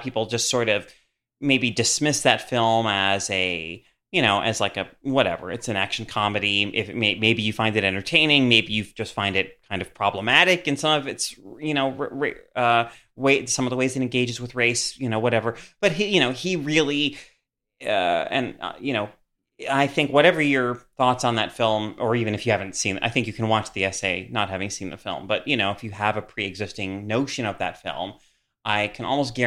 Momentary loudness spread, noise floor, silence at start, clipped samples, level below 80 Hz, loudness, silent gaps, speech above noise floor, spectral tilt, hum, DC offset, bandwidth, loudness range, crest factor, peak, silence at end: 11 LU; -56 dBFS; 0 s; under 0.1%; -58 dBFS; -22 LUFS; none; 33 dB; -3.5 dB/octave; none; under 0.1%; 15 kHz; 6 LU; 22 dB; -2 dBFS; 0 s